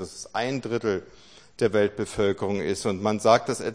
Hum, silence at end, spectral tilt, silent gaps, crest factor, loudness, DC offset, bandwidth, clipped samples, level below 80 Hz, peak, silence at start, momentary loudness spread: none; 0 s; -5 dB/octave; none; 20 dB; -25 LUFS; 0.1%; 10.5 kHz; under 0.1%; -56 dBFS; -4 dBFS; 0 s; 8 LU